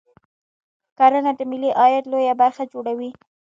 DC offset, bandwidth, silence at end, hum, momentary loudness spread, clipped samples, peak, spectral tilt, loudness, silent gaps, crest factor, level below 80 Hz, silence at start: under 0.1%; 7.4 kHz; 0.3 s; none; 12 LU; under 0.1%; -2 dBFS; -5.5 dB/octave; -19 LUFS; none; 18 dB; -74 dBFS; 1 s